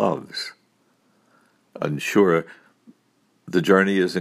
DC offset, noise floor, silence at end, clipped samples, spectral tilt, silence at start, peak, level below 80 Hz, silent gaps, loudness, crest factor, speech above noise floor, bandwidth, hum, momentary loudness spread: under 0.1%; -65 dBFS; 0 s; under 0.1%; -5.5 dB/octave; 0 s; -2 dBFS; -68 dBFS; none; -21 LUFS; 20 dB; 44 dB; 15.5 kHz; none; 14 LU